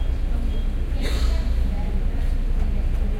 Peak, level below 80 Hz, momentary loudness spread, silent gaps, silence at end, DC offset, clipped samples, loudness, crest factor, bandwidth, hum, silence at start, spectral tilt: -10 dBFS; -20 dBFS; 3 LU; none; 0 s; under 0.1%; under 0.1%; -26 LUFS; 10 dB; 10.5 kHz; none; 0 s; -6.5 dB/octave